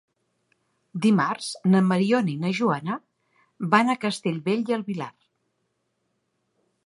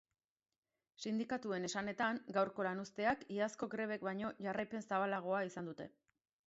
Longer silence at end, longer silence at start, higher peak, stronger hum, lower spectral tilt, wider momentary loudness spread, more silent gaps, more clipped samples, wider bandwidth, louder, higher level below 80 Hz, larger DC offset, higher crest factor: first, 1.75 s vs 0.6 s; about the same, 0.95 s vs 1 s; first, -2 dBFS vs -22 dBFS; neither; first, -6 dB/octave vs -4 dB/octave; first, 13 LU vs 6 LU; neither; neither; first, 11.5 kHz vs 7.6 kHz; first, -24 LUFS vs -40 LUFS; about the same, -74 dBFS vs -78 dBFS; neither; first, 24 dB vs 18 dB